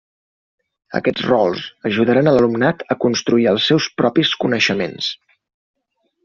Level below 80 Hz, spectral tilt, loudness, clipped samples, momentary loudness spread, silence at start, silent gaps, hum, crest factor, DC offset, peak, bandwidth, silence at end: -56 dBFS; -3.5 dB/octave; -17 LUFS; under 0.1%; 9 LU; 0.9 s; none; none; 16 dB; under 0.1%; -2 dBFS; 7.2 kHz; 1.1 s